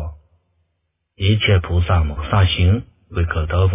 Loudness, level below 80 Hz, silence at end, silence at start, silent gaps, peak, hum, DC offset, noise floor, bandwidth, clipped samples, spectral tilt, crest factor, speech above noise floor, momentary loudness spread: -18 LUFS; -24 dBFS; 0 s; 0 s; none; -2 dBFS; none; under 0.1%; -72 dBFS; 3.8 kHz; under 0.1%; -10.5 dB/octave; 16 dB; 56 dB; 8 LU